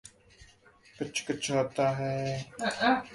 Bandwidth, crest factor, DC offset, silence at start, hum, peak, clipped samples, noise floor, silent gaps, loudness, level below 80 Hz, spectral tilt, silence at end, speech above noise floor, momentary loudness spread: 11.5 kHz; 20 dB; under 0.1%; 0.05 s; none; -12 dBFS; under 0.1%; -59 dBFS; none; -31 LUFS; -64 dBFS; -4.5 dB/octave; 0 s; 29 dB; 8 LU